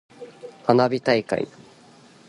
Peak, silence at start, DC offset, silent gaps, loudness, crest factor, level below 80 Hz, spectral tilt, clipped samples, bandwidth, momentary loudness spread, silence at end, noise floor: -2 dBFS; 0.2 s; under 0.1%; none; -22 LUFS; 22 dB; -64 dBFS; -6.5 dB/octave; under 0.1%; 11.5 kHz; 22 LU; 0.8 s; -51 dBFS